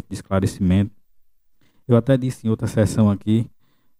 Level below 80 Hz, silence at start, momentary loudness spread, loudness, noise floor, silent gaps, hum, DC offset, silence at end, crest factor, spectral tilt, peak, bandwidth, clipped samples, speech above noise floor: -46 dBFS; 0.1 s; 6 LU; -20 LUFS; -55 dBFS; none; none; under 0.1%; 0.55 s; 18 dB; -7.5 dB/octave; -2 dBFS; 14 kHz; under 0.1%; 37 dB